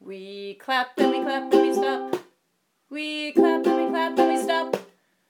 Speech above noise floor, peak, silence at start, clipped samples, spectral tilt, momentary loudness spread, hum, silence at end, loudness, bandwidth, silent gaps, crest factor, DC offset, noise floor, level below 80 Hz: 49 dB; -4 dBFS; 0.05 s; under 0.1%; -4 dB/octave; 15 LU; none; 0.45 s; -23 LUFS; 18 kHz; none; 20 dB; under 0.1%; -72 dBFS; -84 dBFS